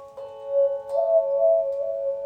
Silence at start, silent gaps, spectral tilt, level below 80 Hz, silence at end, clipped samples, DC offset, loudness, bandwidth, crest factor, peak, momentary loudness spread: 0 s; none; -5.5 dB/octave; -68 dBFS; 0 s; under 0.1%; under 0.1%; -23 LUFS; 4.2 kHz; 12 dB; -10 dBFS; 9 LU